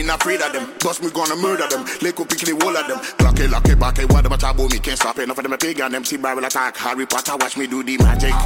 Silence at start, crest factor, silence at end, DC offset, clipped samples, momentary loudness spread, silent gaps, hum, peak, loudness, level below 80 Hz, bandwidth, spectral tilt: 0 s; 14 dB; 0 s; under 0.1%; under 0.1%; 6 LU; none; none; -2 dBFS; -19 LUFS; -20 dBFS; 17 kHz; -4 dB/octave